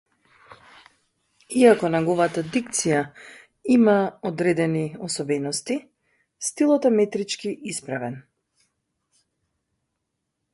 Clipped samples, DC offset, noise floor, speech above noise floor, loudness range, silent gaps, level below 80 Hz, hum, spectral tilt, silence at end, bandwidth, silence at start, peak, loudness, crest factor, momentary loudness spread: under 0.1%; under 0.1%; -79 dBFS; 57 dB; 6 LU; none; -66 dBFS; none; -5 dB/octave; 2.35 s; 11.5 kHz; 0.5 s; -2 dBFS; -22 LUFS; 22 dB; 13 LU